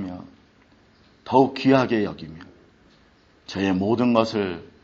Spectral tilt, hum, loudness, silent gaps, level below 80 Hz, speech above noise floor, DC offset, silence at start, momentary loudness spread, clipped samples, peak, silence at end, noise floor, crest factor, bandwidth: -5.5 dB/octave; none; -21 LUFS; none; -60 dBFS; 36 dB; under 0.1%; 0 s; 17 LU; under 0.1%; -2 dBFS; 0.15 s; -57 dBFS; 22 dB; 7.8 kHz